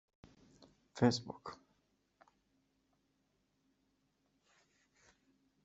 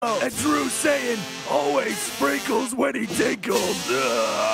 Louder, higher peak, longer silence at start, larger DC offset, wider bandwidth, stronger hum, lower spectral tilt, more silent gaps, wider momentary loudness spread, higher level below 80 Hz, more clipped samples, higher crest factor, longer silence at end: second, -36 LUFS vs -23 LUFS; second, -16 dBFS vs -6 dBFS; first, 0.95 s vs 0 s; neither; second, 8 kHz vs 16 kHz; first, 50 Hz at -85 dBFS vs none; first, -5.5 dB/octave vs -2.5 dB/octave; neither; first, 22 LU vs 3 LU; second, -76 dBFS vs -58 dBFS; neither; first, 28 dB vs 16 dB; first, 4.1 s vs 0 s